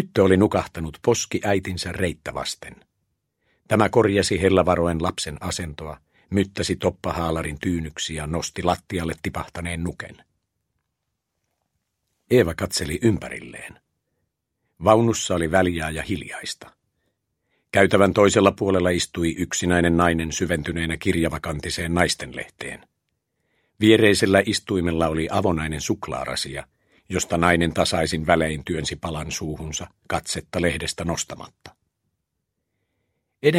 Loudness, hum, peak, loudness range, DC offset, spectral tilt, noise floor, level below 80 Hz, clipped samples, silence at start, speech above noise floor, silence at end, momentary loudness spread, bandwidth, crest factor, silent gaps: -22 LUFS; none; 0 dBFS; 7 LU; under 0.1%; -4.5 dB/octave; -79 dBFS; -44 dBFS; under 0.1%; 0 s; 57 dB; 0 s; 14 LU; 16 kHz; 24 dB; none